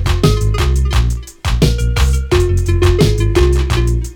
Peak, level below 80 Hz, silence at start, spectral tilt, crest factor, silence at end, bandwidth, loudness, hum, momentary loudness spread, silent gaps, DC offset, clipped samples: 0 dBFS; -16 dBFS; 0 s; -6 dB/octave; 12 dB; 0 s; 17 kHz; -14 LUFS; none; 4 LU; none; under 0.1%; under 0.1%